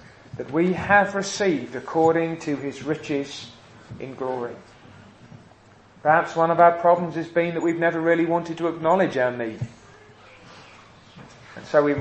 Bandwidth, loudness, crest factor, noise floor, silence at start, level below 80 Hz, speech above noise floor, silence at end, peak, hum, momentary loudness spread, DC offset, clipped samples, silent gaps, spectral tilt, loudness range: 8.6 kHz; -22 LUFS; 20 dB; -52 dBFS; 0.35 s; -62 dBFS; 30 dB; 0 s; -4 dBFS; none; 19 LU; under 0.1%; under 0.1%; none; -5.5 dB/octave; 10 LU